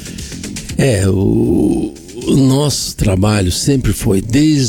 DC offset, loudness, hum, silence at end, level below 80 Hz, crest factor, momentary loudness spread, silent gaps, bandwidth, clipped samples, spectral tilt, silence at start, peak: under 0.1%; -14 LUFS; none; 0 s; -28 dBFS; 10 dB; 12 LU; none; 18.5 kHz; under 0.1%; -5.5 dB/octave; 0 s; -4 dBFS